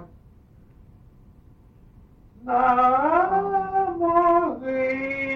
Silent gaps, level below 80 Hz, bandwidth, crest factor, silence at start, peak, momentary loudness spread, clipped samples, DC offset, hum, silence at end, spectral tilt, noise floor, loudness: none; -52 dBFS; 6.2 kHz; 16 dB; 0 s; -8 dBFS; 8 LU; under 0.1%; under 0.1%; none; 0 s; -8 dB/octave; -51 dBFS; -21 LUFS